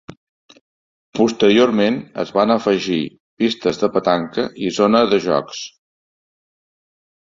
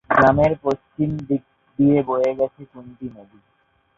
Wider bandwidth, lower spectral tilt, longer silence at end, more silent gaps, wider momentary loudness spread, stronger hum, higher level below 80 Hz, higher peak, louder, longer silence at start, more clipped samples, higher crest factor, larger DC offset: about the same, 7.6 kHz vs 7.2 kHz; second, -5 dB/octave vs -9 dB/octave; first, 1.6 s vs 0.75 s; first, 3.20-3.37 s vs none; second, 11 LU vs 21 LU; neither; second, -58 dBFS vs -48 dBFS; about the same, -2 dBFS vs -2 dBFS; first, -17 LUFS vs -20 LUFS; first, 1.15 s vs 0.1 s; neither; about the same, 18 dB vs 18 dB; neither